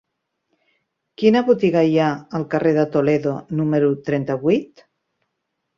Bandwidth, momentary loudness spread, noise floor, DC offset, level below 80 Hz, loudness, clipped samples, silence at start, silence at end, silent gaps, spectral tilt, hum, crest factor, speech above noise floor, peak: 7.2 kHz; 7 LU; -76 dBFS; under 0.1%; -60 dBFS; -19 LUFS; under 0.1%; 1.2 s; 1.15 s; none; -8 dB/octave; none; 18 dB; 58 dB; -2 dBFS